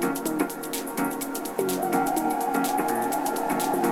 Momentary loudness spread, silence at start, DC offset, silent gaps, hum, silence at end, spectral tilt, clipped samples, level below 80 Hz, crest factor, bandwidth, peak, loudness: 5 LU; 0 s; under 0.1%; none; none; 0 s; -4 dB/octave; under 0.1%; -58 dBFS; 16 dB; 19 kHz; -10 dBFS; -26 LUFS